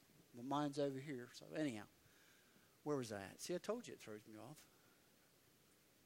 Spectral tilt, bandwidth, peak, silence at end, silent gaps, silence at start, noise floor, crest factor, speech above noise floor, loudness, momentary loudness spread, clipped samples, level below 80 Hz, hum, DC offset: -5 dB/octave; 16 kHz; -28 dBFS; 1.4 s; none; 0.1 s; -73 dBFS; 22 dB; 26 dB; -47 LUFS; 17 LU; under 0.1%; -88 dBFS; none; under 0.1%